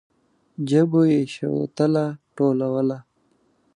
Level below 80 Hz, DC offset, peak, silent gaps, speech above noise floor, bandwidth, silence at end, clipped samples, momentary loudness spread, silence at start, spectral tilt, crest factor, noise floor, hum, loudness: -68 dBFS; under 0.1%; -6 dBFS; none; 44 dB; 10.5 kHz; 0.75 s; under 0.1%; 12 LU; 0.6 s; -8 dB/octave; 16 dB; -64 dBFS; none; -22 LUFS